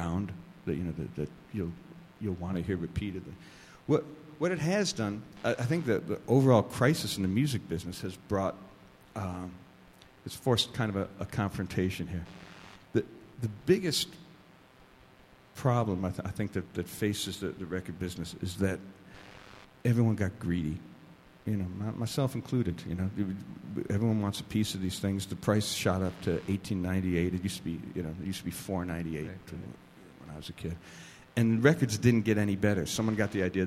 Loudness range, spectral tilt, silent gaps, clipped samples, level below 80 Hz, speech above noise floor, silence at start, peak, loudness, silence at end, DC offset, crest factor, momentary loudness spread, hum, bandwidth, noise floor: 7 LU; -6 dB/octave; none; under 0.1%; -56 dBFS; 27 dB; 0 s; -8 dBFS; -32 LUFS; 0 s; under 0.1%; 24 dB; 17 LU; none; 16 kHz; -58 dBFS